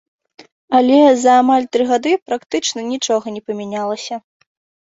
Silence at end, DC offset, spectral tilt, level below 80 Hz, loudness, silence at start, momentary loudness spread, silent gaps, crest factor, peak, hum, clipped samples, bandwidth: 0.75 s; under 0.1%; -3.5 dB/octave; -62 dBFS; -16 LUFS; 0.4 s; 15 LU; 0.52-0.68 s, 2.22-2.26 s; 14 dB; -2 dBFS; none; under 0.1%; 8 kHz